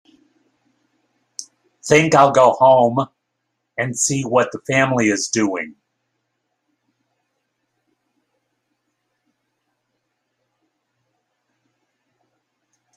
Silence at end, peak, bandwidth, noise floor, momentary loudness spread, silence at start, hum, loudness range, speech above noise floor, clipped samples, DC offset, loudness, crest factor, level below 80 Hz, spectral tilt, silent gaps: 7.25 s; -2 dBFS; 14 kHz; -75 dBFS; 21 LU; 1.4 s; none; 9 LU; 59 dB; under 0.1%; under 0.1%; -16 LUFS; 20 dB; -60 dBFS; -4 dB/octave; none